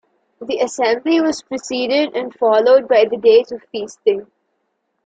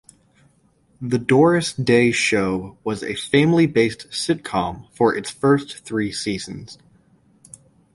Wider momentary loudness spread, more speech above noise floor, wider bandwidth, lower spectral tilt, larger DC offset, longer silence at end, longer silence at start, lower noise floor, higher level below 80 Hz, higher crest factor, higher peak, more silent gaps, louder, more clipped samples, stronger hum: about the same, 13 LU vs 12 LU; first, 54 dB vs 40 dB; second, 9 kHz vs 11.5 kHz; second, -3.5 dB/octave vs -5.5 dB/octave; neither; second, 0.8 s vs 1.2 s; second, 0.4 s vs 1 s; first, -70 dBFS vs -59 dBFS; second, -64 dBFS vs -52 dBFS; about the same, 14 dB vs 18 dB; about the same, -2 dBFS vs -2 dBFS; neither; first, -16 LUFS vs -20 LUFS; neither; neither